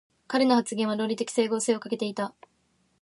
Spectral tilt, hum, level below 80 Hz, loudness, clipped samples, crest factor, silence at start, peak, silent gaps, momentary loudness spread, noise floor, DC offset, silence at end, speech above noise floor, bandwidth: -4 dB/octave; none; -78 dBFS; -27 LUFS; under 0.1%; 18 dB; 0.3 s; -10 dBFS; none; 9 LU; -69 dBFS; under 0.1%; 0.7 s; 43 dB; 11.5 kHz